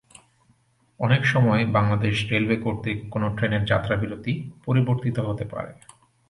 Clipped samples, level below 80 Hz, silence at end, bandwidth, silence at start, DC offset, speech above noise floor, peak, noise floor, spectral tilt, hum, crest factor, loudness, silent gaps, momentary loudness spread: under 0.1%; -48 dBFS; 0.55 s; 11.5 kHz; 1 s; under 0.1%; 40 dB; -6 dBFS; -63 dBFS; -7 dB/octave; none; 18 dB; -23 LUFS; none; 10 LU